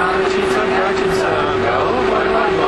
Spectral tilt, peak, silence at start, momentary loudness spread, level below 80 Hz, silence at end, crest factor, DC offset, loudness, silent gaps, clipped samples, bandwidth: -5 dB/octave; -2 dBFS; 0 s; 1 LU; -38 dBFS; 0 s; 14 dB; under 0.1%; -16 LUFS; none; under 0.1%; 12 kHz